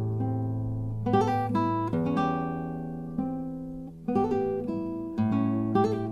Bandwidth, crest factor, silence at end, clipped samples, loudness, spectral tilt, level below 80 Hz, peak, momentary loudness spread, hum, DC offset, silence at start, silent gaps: 7 kHz; 16 dB; 0 s; under 0.1%; -29 LUFS; -9 dB/octave; -50 dBFS; -12 dBFS; 9 LU; none; under 0.1%; 0 s; none